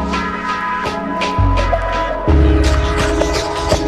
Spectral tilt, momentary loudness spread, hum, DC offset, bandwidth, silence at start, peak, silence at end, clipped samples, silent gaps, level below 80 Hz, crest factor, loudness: -5.5 dB/octave; 6 LU; none; under 0.1%; 12.5 kHz; 0 s; -2 dBFS; 0 s; under 0.1%; none; -18 dBFS; 14 dB; -16 LUFS